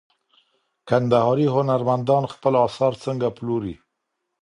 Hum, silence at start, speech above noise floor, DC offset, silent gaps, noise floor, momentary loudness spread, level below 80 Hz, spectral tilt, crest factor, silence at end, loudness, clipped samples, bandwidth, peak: none; 0.85 s; 58 dB; under 0.1%; none; -78 dBFS; 8 LU; -58 dBFS; -8 dB/octave; 18 dB; 0.65 s; -21 LUFS; under 0.1%; 11 kHz; -4 dBFS